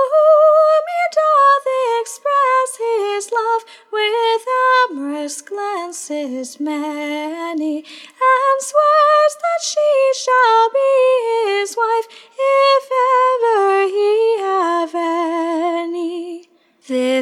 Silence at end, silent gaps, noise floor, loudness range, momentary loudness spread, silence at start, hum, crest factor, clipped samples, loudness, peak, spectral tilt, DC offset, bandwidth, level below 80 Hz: 0 s; none; -48 dBFS; 6 LU; 12 LU; 0 s; none; 14 dB; under 0.1%; -16 LUFS; -2 dBFS; -0.5 dB/octave; under 0.1%; 14.5 kHz; -88 dBFS